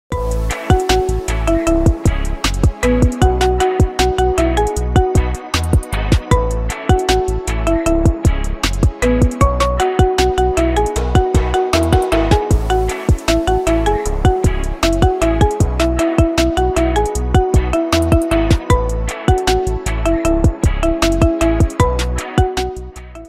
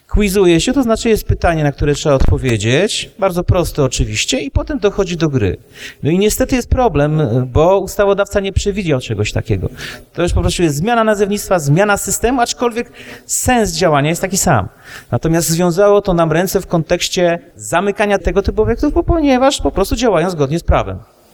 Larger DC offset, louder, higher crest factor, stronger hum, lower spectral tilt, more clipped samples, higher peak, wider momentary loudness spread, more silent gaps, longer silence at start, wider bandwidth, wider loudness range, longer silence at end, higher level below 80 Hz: neither; about the same, -16 LUFS vs -14 LUFS; about the same, 14 dB vs 14 dB; neither; about the same, -6 dB/octave vs -5 dB/octave; neither; about the same, 0 dBFS vs -2 dBFS; about the same, 5 LU vs 7 LU; neither; about the same, 0.1 s vs 0.1 s; second, 15.5 kHz vs over 20 kHz; about the same, 1 LU vs 2 LU; second, 0 s vs 0.3 s; first, -20 dBFS vs -26 dBFS